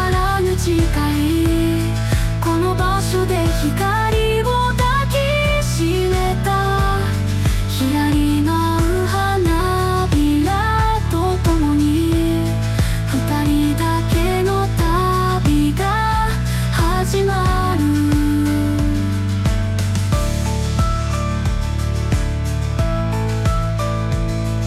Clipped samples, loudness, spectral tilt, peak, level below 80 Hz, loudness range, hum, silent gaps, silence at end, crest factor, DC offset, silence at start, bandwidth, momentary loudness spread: under 0.1%; -18 LUFS; -6 dB/octave; -6 dBFS; -24 dBFS; 3 LU; none; none; 0 s; 10 dB; under 0.1%; 0 s; 15.5 kHz; 4 LU